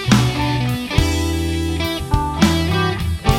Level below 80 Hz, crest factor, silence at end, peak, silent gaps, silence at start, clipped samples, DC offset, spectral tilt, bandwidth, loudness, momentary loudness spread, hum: -26 dBFS; 16 dB; 0 s; 0 dBFS; none; 0 s; under 0.1%; under 0.1%; -5.5 dB/octave; 18 kHz; -18 LUFS; 5 LU; none